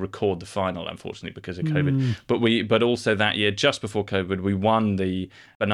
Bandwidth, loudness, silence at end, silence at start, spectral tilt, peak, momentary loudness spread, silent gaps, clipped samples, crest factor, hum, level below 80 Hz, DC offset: 11.5 kHz; -24 LUFS; 0 s; 0 s; -6 dB/octave; -6 dBFS; 13 LU; 5.55-5.60 s; under 0.1%; 18 dB; none; -56 dBFS; under 0.1%